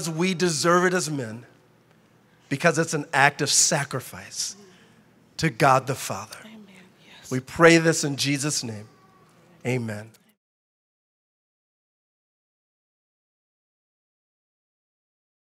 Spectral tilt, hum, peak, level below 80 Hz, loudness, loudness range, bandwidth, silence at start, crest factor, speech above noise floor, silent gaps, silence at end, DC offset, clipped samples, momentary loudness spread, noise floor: -3.5 dB/octave; none; -2 dBFS; -64 dBFS; -22 LUFS; 14 LU; 16 kHz; 0 s; 24 dB; 35 dB; none; 5.35 s; under 0.1%; under 0.1%; 18 LU; -58 dBFS